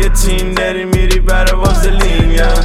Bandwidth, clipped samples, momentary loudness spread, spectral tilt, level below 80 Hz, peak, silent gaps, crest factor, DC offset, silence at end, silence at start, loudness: 15 kHz; under 0.1%; 2 LU; -4.5 dB/octave; -10 dBFS; 0 dBFS; none; 8 dB; under 0.1%; 0 s; 0 s; -13 LUFS